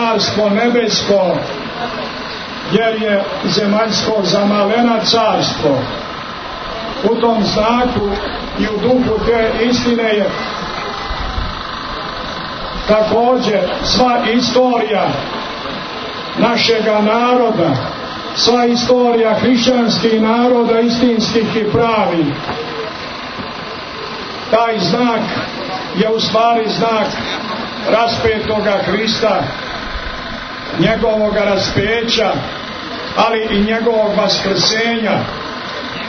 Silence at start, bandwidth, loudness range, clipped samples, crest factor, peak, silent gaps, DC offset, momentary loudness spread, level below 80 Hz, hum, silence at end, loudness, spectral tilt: 0 s; 6.6 kHz; 4 LU; under 0.1%; 14 dB; 0 dBFS; none; under 0.1%; 11 LU; -36 dBFS; none; 0 s; -15 LUFS; -4.5 dB/octave